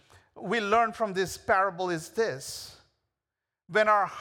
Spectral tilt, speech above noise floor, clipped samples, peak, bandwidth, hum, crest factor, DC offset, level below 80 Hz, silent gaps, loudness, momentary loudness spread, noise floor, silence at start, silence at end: -4 dB/octave; 62 dB; under 0.1%; -10 dBFS; 19.5 kHz; none; 18 dB; under 0.1%; -64 dBFS; none; -27 LUFS; 15 LU; -89 dBFS; 0.35 s; 0 s